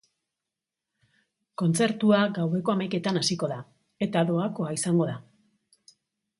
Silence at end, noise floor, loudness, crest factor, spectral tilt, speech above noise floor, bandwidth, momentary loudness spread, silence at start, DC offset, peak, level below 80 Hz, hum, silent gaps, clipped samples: 1.2 s; -88 dBFS; -26 LUFS; 20 dB; -5.5 dB/octave; 63 dB; 11.5 kHz; 10 LU; 1.6 s; under 0.1%; -8 dBFS; -70 dBFS; none; none; under 0.1%